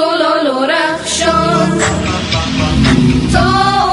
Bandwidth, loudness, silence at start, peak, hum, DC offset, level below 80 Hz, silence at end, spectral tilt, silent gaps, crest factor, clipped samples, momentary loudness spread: 11.5 kHz; -12 LUFS; 0 s; 0 dBFS; none; under 0.1%; -26 dBFS; 0 s; -4.5 dB/octave; none; 12 dB; under 0.1%; 4 LU